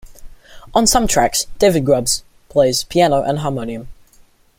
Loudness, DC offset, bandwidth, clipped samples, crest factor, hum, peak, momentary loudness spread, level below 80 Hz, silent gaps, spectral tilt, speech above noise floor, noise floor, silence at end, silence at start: -16 LUFS; under 0.1%; 16.5 kHz; under 0.1%; 16 dB; none; -2 dBFS; 9 LU; -36 dBFS; none; -3.5 dB/octave; 34 dB; -50 dBFS; 0.65 s; 0.05 s